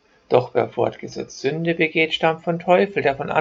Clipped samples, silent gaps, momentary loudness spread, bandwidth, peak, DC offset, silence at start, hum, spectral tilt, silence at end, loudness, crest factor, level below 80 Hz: under 0.1%; none; 8 LU; 7.6 kHz; 0 dBFS; under 0.1%; 0.3 s; none; -5.5 dB/octave; 0 s; -20 LUFS; 20 dB; -60 dBFS